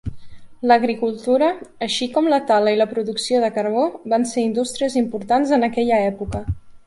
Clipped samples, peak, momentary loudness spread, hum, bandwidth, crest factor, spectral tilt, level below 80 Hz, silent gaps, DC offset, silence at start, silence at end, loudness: under 0.1%; -2 dBFS; 9 LU; none; 11.5 kHz; 16 dB; -5 dB/octave; -42 dBFS; none; under 0.1%; 0.05 s; 0.1 s; -19 LUFS